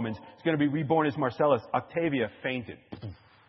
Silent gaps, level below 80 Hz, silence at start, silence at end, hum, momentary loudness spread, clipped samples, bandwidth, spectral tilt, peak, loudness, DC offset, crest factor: none; -68 dBFS; 0 s; 0.35 s; none; 17 LU; under 0.1%; 6 kHz; -9.5 dB/octave; -10 dBFS; -28 LUFS; under 0.1%; 18 dB